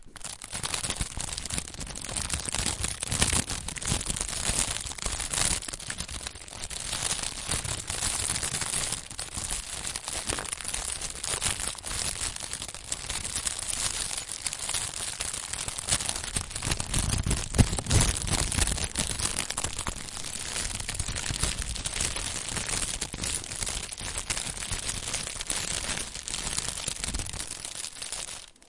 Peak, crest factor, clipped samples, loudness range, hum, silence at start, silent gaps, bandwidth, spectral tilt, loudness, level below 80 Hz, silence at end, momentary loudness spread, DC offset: -6 dBFS; 26 dB; under 0.1%; 4 LU; none; 0 s; none; 11.5 kHz; -2 dB/octave; -30 LUFS; -40 dBFS; 0 s; 8 LU; under 0.1%